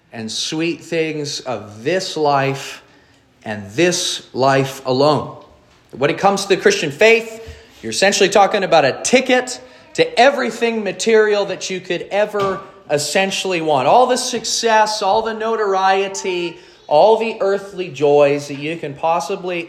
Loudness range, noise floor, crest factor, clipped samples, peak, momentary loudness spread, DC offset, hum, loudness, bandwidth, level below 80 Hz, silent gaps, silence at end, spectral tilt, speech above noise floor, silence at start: 4 LU; -51 dBFS; 16 dB; under 0.1%; 0 dBFS; 12 LU; under 0.1%; none; -16 LUFS; 14.5 kHz; -58 dBFS; none; 0 s; -3.5 dB/octave; 35 dB; 0.15 s